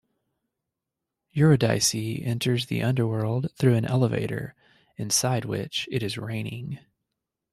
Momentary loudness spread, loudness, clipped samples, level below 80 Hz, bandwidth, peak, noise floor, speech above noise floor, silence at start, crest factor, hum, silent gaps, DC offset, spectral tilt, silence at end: 14 LU; -25 LUFS; under 0.1%; -60 dBFS; 14.5 kHz; -8 dBFS; -86 dBFS; 61 dB; 1.35 s; 18 dB; none; none; under 0.1%; -5 dB/octave; 0.75 s